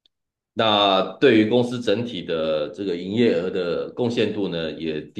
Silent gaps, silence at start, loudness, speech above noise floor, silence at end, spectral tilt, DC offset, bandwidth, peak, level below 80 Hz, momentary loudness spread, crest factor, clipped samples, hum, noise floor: none; 0.55 s; -21 LUFS; 53 dB; 0.1 s; -6 dB/octave; under 0.1%; 9.4 kHz; -4 dBFS; -62 dBFS; 10 LU; 16 dB; under 0.1%; none; -75 dBFS